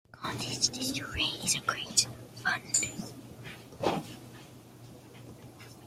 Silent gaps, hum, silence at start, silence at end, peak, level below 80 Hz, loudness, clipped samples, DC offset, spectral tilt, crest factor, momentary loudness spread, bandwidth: none; none; 0.15 s; 0 s; -8 dBFS; -58 dBFS; -30 LUFS; under 0.1%; under 0.1%; -1.5 dB/octave; 26 dB; 23 LU; 16 kHz